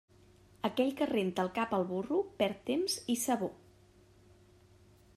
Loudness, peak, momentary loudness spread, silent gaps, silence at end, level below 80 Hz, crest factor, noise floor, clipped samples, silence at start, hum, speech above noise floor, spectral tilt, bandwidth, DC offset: -34 LUFS; -18 dBFS; 3 LU; none; 1.6 s; -70 dBFS; 18 dB; -62 dBFS; under 0.1%; 0.65 s; none; 29 dB; -4.5 dB/octave; 15.5 kHz; under 0.1%